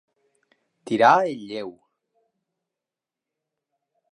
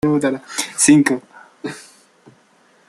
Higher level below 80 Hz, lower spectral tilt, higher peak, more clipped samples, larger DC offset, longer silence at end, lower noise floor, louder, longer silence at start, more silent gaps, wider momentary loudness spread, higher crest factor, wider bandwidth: second, -80 dBFS vs -56 dBFS; about the same, -5 dB/octave vs -4 dB/octave; about the same, -2 dBFS vs 0 dBFS; neither; neither; first, 2.4 s vs 1.1 s; first, -88 dBFS vs -55 dBFS; second, -20 LUFS vs -16 LUFS; first, 0.85 s vs 0.05 s; neither; second, 17 LU vs 20 LU; first, 24 dB vs 18 dB; second, 11 kHz vs 13 kHz